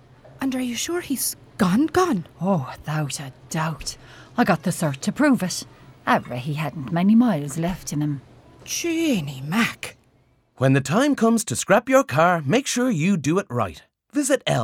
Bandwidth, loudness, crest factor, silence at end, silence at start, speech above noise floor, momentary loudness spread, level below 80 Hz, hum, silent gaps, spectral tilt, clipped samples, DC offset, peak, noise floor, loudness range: 18 kHz; -22 LUFS; 18 dB; 0 s; 0.25 s; 39 dB; 11 LU; -54 dBFS; none; none; -5 dB/octave; under 0.1%; under 0.1%; -4 dBFS; -60 dBFS; 4 LU